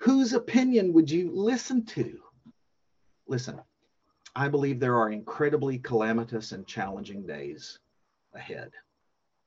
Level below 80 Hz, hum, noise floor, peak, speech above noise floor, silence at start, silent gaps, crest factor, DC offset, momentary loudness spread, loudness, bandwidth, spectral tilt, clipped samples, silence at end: -68 dBFS; none; -79 dBFS; -10 dBFS; 52 dB; 0 s; none; 18 dB; under 0.1%; 18 LU; -27 LUFS; 7.8 kHz; -6 dB/octave; under 0.1%; 0.65 s